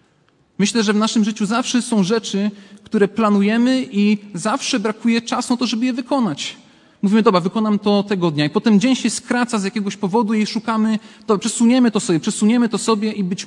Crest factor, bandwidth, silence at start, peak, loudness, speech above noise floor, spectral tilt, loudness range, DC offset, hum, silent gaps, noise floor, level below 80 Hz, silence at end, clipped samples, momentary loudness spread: 18 dB; 11.5 kHz; 0.6 s; 0 dBFS; -18 LUFS; 41 dB; -5 dB/octave; 1 LU; under 0.1%; none; none; -58 dBFS; -66 dBFS; 0 s; under 0.1%; 7 LU